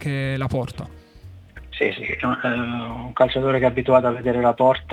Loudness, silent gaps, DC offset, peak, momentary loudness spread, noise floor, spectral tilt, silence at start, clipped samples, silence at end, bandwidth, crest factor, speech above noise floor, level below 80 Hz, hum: -21 LUFS; none; under 0.1%; -4 dBFS; 13 LU; -43 dBFS; -7.5 dB/octave; 0 s; under 0.1%; 0 s; 11 kHz; 18 dB; 23 dB; -46 dBFS; none